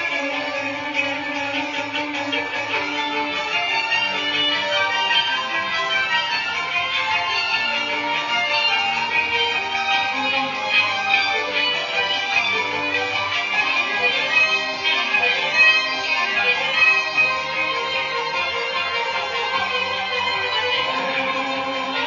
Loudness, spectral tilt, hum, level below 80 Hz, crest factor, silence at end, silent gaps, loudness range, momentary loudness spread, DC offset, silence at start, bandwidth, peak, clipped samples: -19 LUFS; -1.5 dB/octave; none; -64 dBFS; 18 dB; 0 s; none; 5 LU; 6 LU; under 0.1%; 0 s; 7.4 kHz; -4 dBFS; under 0.1%